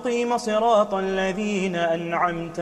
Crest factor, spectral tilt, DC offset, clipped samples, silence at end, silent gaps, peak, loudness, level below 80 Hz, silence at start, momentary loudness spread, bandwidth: 16 dB; -5 dB/octave; under 0.1%; under 0.1%; 0 s; none; -8 dBFS; -23 LUFS; -52 dBFS; 0 s; 5 LU; 12.5 kHz